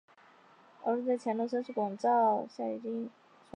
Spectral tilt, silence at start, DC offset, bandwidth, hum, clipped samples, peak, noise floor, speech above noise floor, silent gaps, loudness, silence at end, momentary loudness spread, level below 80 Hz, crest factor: -7 dB/octave; 0.8 s; under 0.1%; 10 kHz; none; under 0.1%; -18 dBFS; -61 dBFS; 29 dB; none; -32 LUFS; 0.45 s; 11 LU; -88 dBFS; 14 dB